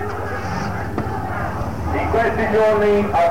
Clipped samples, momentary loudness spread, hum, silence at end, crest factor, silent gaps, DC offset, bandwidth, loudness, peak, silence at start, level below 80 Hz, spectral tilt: under 0.1%; 9 LU; none; 0 s; 10 dB; none; 2%; 16.5 kHz; -20 LUFS; -10 dBFS; 0 s; -34 dBFS; -7 dB/octave